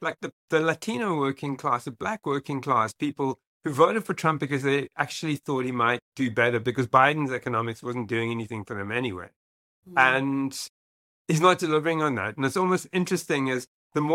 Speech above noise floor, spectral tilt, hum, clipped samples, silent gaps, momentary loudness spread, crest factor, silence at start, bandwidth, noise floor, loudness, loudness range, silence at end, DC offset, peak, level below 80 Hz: over 64 dB; -5.5 dB/octave; none; under 0.1%; 0.33-0.48 s, 3.47-3.60 s, 6.02-6.12 s, 9.36-9.83 s, 10.69-11.25 s, 13.67-13.90 s; 11 LU; 22 dB; 0 s; 16.5 kHz; under -90 dBFS; -26 LUFS; 3 LU; 0 s; under 0.1%; -4 dBFS; -68 dBFS